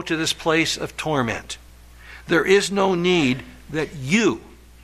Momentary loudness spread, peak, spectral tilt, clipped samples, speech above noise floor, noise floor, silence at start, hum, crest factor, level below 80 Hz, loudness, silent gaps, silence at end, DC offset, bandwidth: 13 LU; -6 dBFS; -4 dB/octave; under 0.1%; 23 dB; -44 dBFS; 0 s; none; 16 dB; -48 dBFS; -21 LUFS; none; 0.3 s; under 0.1%; 14.5 kHz